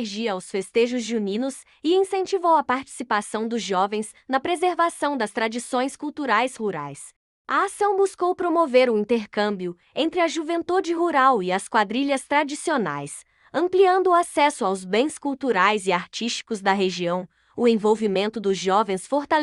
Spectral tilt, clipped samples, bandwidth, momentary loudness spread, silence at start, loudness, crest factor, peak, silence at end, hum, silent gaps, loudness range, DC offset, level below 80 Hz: -4 dB/octave; under 0.1%; 12 kHz; 9 LU; 0 s; -23 LUFS; 18 dB; -4 dBFS; 0 s; none; 7.16-7.45 s; 3 LU; under 0.1%; -68 dBFS